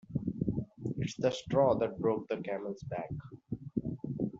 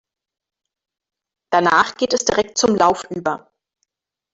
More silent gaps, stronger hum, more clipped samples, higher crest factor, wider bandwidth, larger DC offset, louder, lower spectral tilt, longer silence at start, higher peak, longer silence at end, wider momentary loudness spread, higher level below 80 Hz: neither; neither; neither; about the same, 20 dB vs 18 dB; about the same, 7.8 kHz vs 8 kHz; neither; second, -35 LUFS vs -17 LUFS; first, -7 dB/octave vs -3 dB/octave; second, 0.1 s vs 1.5 s; second, -14 dBFS vs -2 dBFS; second, 0 s vs 0.95 s; about the same, 11 LU vs 9 LU; about the same, -58 dBFS vs -54 dBFS